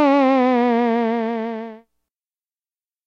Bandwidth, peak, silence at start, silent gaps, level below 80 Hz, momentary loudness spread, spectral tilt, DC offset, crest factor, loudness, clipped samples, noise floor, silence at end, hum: 6.8 kHz; -6 dBFS; 0 s; none; -82 dBFS; 14 LU; -6.5 dB/octave; under 0.1%; 14 dB; -18 LUFS; under 0.1%; under -90 dBFS; 1.3 s; none